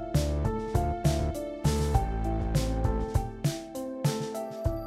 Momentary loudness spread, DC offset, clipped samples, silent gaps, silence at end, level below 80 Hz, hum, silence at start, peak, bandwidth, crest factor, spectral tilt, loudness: 5 LU; under 0.1%; under 0.1%; none; 0 s; -34 dBFS; none; 0 s; -10 dBFS; 15.5 kHz; 18 dB; -6.5 dB/octave; -30 LUFS